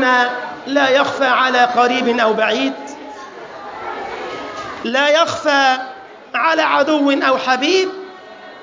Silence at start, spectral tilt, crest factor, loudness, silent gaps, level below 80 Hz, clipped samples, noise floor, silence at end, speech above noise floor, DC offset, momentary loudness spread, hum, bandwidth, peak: 0 s; -3 dB/octave; 16 dB; -15 LUFS; none; -62 dBFS; under 0.1%; -36 dBFS; 0 s; 22 dB; under 0.1%; 19 LU; none; 7.6 kHz; -2 dBFS